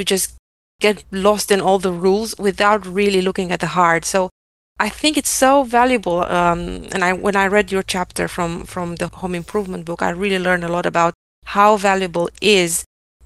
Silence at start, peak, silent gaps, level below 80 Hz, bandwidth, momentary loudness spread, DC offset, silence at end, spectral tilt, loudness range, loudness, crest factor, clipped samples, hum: 0 s; 0 dBFS; 0.39-0.79 s, 4.31-4.76 s, 11.15-11.42 s; -44 dBFS; 13 kHz; 10 LU; 0.2%; 0.4 s; -3.5 dB/octave; 4 LU; -17 LUFS; 18 dB; under 0.1%; none